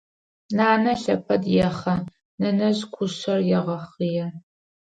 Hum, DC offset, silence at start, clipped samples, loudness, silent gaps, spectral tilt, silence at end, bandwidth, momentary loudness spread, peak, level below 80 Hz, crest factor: none; under 0.1%; 0.5 s; under 0.1%; -23 LUFS; 2.25-2.38 s; -6.5 dB/octave; 0.55 s; 9 kHz; 9 LU; -6 dBFS; -56 dBFS; 16 dB